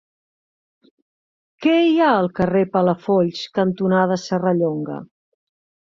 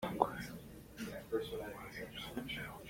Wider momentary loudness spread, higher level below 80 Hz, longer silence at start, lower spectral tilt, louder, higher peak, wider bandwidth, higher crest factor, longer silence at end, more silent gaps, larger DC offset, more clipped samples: second, 7 LU vs 11 LU; about the same, -58 dBFS vs -62 dBFS; first, 1.6 s vs 0 s; first, -7 dB/octave vs -5 dB/octave; first, -19 LUFS vs -43 LUFS; first, -4 dBFS vs -12 dBFS; second, 7.4 kHz vs 16.5 kHz; second, 16 dB vs 30 dB; first, 0.8 s vs 0 s; neither; neither; neither